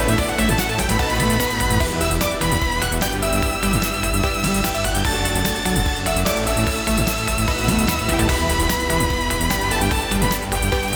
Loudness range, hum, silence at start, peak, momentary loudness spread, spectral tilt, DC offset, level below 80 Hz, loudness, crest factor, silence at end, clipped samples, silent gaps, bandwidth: 1 LU; none; 0 s; -4 dBFS; 2 LU; -4 dB/octave; under 0.1%; -26 dBFS; -19 LUFS; 16 dB; 0 s; under 0.1%; none; over 20 kHz